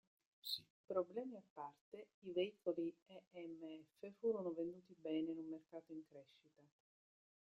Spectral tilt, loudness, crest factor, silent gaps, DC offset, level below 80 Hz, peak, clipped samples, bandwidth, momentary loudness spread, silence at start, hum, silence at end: -5.5 dB/octave; -48 LUFS; 20 dB; 0.70-0.88 s, 1.50-1.56 s, 1.81-1.92 s, 2.14-2.22 s, 3.02-3.06 s, 3.27-3.31 s; under 0.1%; under -90 dBFS; -28 dBFS; under 0.1%; 13 kHz; 15 LU; 0.45 s; none; 0.8 s